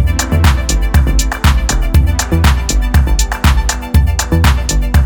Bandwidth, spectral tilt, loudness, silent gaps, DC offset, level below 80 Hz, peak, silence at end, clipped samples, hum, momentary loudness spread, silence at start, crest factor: 19 kHz; -4.5 dB/octave; -13 LUFS; none; 0.2%; -12 dBFS; 0 dBFS; 0 s; under 0.1%; none; 3 LU; 0 s; 10 dB